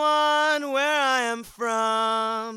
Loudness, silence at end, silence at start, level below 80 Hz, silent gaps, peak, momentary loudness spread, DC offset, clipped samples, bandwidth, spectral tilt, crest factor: -23 LUFS; 0 s; 0 s; -66 dBFS; none; -10 dBFS; 7 LU; under 0.1%; under 0.1%; 16 kHz; -1.5 dB/octave; 14 dB